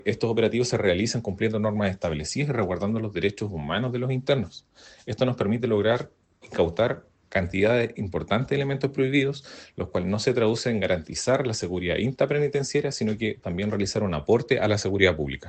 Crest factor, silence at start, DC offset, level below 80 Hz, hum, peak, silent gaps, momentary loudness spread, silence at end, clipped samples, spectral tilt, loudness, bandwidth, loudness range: 20 dB; 0.05 s; under 0.1%; -52 dBFS; none; -4 dBFS; none; 7 LU; 0 s; under 0.1%; -5.5 dB/octave; -25 LUFS; 9 kHz; 2 LU